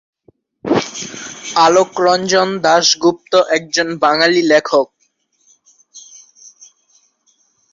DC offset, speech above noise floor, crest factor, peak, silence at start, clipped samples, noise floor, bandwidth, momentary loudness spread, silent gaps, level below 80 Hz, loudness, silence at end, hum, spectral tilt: under 0.1%; 49 dB; 16 dB; 0 dBFS; 0.65 s; under 0.1%; -62 dBFS; 7.8 kHz; 14 LU; none; -60 dBFS; -14 LUFS; 1.75 s; none; -3 dB/octave